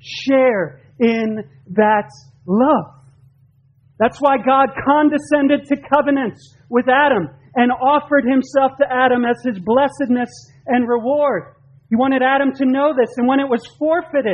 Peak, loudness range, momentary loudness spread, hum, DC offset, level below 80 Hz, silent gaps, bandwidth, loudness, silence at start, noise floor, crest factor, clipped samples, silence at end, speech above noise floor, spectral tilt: 0 dBFS; 2 LU; 8 LU; none; under 0.1%; -56 dBFS; none; 9.8 kHz; -16 LUFS; 0.05 s; -54 dBFS; 16 dB; under 0.1%; 0 s; 38 dB; -6.5 dB/octave